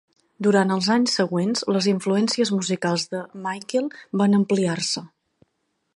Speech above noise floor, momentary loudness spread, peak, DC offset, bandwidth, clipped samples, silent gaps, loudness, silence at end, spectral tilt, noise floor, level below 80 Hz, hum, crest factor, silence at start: 52 dB; 9 LU; -4 dBFS; under 0.1%; 11 kHz; under 0.1%; none; -22 LUFS; 0.9 s; -5 dB/octave; -74 dBFS; -70 dBFS; none; 18 dB; 0.4 s